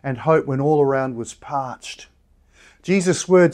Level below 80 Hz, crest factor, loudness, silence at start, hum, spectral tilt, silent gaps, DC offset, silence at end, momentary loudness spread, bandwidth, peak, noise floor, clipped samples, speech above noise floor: -56 dBFS; 16 dB; -20 LUFS; 0.05 s; none; -6 dB/octave; none; under 0.1%; 0 s; 17 LU; 11 kHz; -4 dBFS; -55 dBFS; under 0.1%; 36 dB